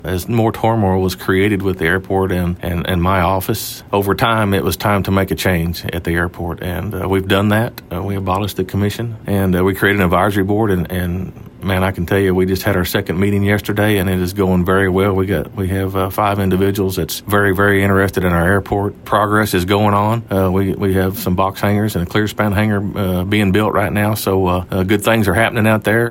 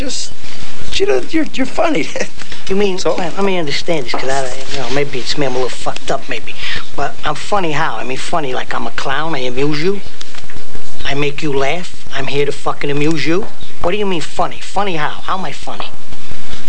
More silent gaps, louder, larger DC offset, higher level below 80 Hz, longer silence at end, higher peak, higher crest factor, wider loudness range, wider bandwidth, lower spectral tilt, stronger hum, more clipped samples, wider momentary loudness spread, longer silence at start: neither; first, -16 LUFS vs -19 LUFS; second, under 0.1% vs 50%; about the same, -38 dBFS vs -36 dBFS; about the same, 0 s vs 0 s; about the same, -2 dBFS vs 0 dBFS; about the same, 14 dB vs 14 dB; about the same, 2 LU vs 2 LU; first, 16.5 kHz vs 11 kHz; first, -6 dB/octave vs -4.5 dB/octave; neither; neither; second, 6 LU vs 13 LU; about the same, 0 s vs 0 s